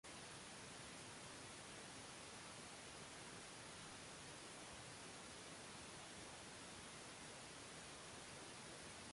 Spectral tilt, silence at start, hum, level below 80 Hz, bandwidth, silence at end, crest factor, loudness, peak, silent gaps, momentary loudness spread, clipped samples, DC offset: -2.5 dB/octave; 0.05 s; none; -76 dBFS; 11.5 kHz; 0 s; 14 dB; -55 LUFS; -44 dBFS; none; 0 LU; under 0.1%; under 0.1%